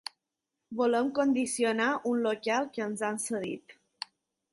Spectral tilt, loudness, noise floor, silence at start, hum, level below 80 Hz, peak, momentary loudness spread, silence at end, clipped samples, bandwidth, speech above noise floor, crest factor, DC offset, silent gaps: -3.5 dB/octave; -30 LUFS; -86 dBFS; 0.7 s; none; -76 dBFS; -16 dBFS; 16 LU; 0.8 s; under 0.1%; 12 kHz; 57 dB; 16 dB; under 0.1%; none